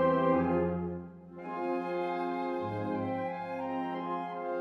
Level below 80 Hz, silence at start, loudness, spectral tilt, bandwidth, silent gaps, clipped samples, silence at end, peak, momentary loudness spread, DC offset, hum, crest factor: -62 dBFS; 0 s; -33 LUFS; -9 dB/octave; 6 kHz; none; under 0.1%; 0 s; -16 dBFS; 11 LU; under 0.1%; none; 16 dB